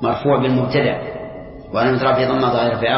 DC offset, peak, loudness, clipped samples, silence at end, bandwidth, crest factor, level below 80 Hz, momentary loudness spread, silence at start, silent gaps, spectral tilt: under 0.1%; -4 dBFS; -17 LUFS; under 0.1%; 0 s; 5.8 kHz; 14 dB; -46 dBFS; 14 LU; 0 s; none; -11 dB/octave